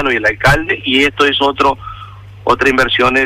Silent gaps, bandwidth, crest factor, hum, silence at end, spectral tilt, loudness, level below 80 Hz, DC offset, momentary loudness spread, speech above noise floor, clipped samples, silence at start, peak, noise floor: none; 16 kHz; 12 dB; none; 0 s; -4.5 dB/octave; -12 LUFS; -32 dBFS; under 0.1%; 12 LU; 20 dB; under 0.1%; 0 s; -2 dBFS; -33 dBFS